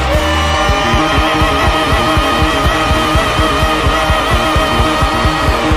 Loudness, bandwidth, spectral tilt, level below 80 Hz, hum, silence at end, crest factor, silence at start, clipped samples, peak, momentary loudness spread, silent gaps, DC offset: -12 LUFS; 16 kHz; -4.5 dB/octave; -18 dBFS; none; 0 s; 10 dB; 0 s; under 0.1%; -2 dBFS; 1 LU; none; 0.3%